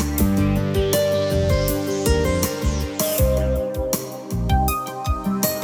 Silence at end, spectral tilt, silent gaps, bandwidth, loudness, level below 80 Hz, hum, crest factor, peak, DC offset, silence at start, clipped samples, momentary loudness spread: 0 s; -5.5 dB/octave; none; 19 kHz; -21 LUFS; -26 dBFS; none; 16 dB; -6 dBFS; under 0.1%; 0 s; under 0.1%; 6 LU